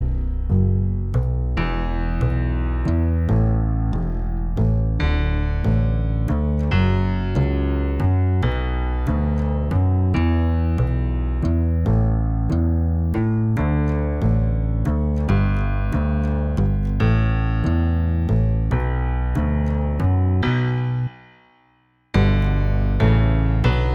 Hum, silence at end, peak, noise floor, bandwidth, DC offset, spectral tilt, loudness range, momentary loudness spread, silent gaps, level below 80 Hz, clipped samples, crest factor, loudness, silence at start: none; 0 s; -4 dBFS; -60 dBFS; 6.6 kHz; under 0.1%; -9 dB/octave; 1 LU; 4 LU; none; -24 dBFS; under 0.1%; 16 dB; -21 LUFS; 0 s